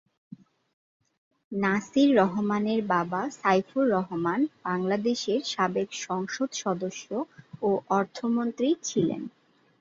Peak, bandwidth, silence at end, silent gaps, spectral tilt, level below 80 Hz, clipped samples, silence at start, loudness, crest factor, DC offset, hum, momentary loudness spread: -8 dBFS; 7.8 kHz; 0.5 s; 0.73-1.00 s, 1.18-1.31 s, 1.44-1.51 s; -5 dB/octave; -70 dBFS; under 0.1%; 0.3 s; -27 LUFS; 18 dB; under 0.1%; none; 9 LU